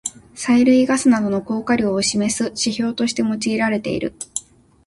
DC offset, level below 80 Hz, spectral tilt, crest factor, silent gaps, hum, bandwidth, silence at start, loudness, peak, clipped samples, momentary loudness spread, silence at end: under 0.1%; -52 dBFS; -4 dB/octave; 14 dB; none; none; 11.5 kHz; 0.05 s; -19 LUFS; -4 dBFS; under 0.1%; 13 LU; 0.45 s